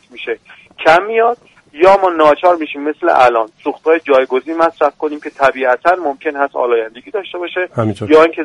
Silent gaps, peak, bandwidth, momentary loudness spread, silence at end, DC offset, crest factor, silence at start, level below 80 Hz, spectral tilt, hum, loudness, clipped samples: none; 0 dBFS; 11 kHz; 12 LU; 0 s; under 0.1%; 14 dB; 0.15 s; -52 dBFS; -6 dB/octave; none; -13 LUFS; under 0.1%